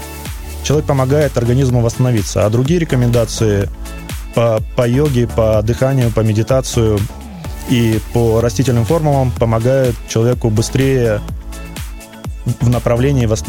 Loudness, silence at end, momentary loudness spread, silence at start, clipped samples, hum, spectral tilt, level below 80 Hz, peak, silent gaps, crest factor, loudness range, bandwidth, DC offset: -14 LUFS; 0 s; 14 LU; 0 s; under 0.1%; none; -6.5 dB/octave; -28 dBFS; -2 dBFS; none; 12 dB; 2 LU; 17 kHz; 0.3%